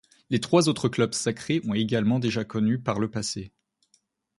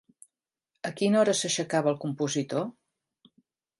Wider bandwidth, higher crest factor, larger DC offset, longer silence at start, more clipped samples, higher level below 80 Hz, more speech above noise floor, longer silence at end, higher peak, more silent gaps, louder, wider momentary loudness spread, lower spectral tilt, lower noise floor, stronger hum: about the same, 11.5 kHz vs 11.5 kHz; about the same, 20 dB vs 18 dB; neither; second, 0.3 s vs 0.85 s; neither; first, -60 dBFS vs -76 dBFS; second, 44 dB vs 57 dB; second, 0.9 s vs 1.1 s; first, -6 dBFS vs -10 dBFS; neither; about the same, -26 LUFS vs -27 LUFS; second, 9 LU vs 14 LU; first, -5.5 dB/octave vs -4 dB/octave; second, -69 dBFS vs -83 dBFS; neither